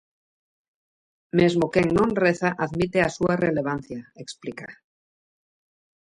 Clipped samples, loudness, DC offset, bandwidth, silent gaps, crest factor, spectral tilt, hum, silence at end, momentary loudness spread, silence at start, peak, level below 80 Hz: under 0.1%; -23 LUFS; under 0.1%; 11 kHz; none; 20 dB; -6.5 dB/octave; none; 1.3 s; 17 LU; 1.35 s; -6 dBFS; -52 dBFS